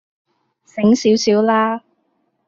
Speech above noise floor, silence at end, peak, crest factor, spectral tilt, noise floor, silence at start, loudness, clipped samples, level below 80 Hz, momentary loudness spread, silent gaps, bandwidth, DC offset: 52 dB; 0.7 s; -4 dBFS; 14 dB; -5 dB/octave; -66 dBFS; 0.75 s; -15 LUFS; under 0.1%; -60 dBFS; 12 LU; none; 7.6 kHz; under 0.1%